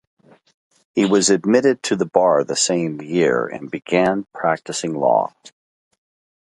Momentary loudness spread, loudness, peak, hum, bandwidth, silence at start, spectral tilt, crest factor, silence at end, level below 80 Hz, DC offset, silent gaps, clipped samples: 8 LU; -18 LUFS; 0 dBFS; none; 11.5 kHz; 0.95 s; -4 dB/octave; 20 dB; 1.2 s; -62 dBFS; under 0.1%; none; under 0.1%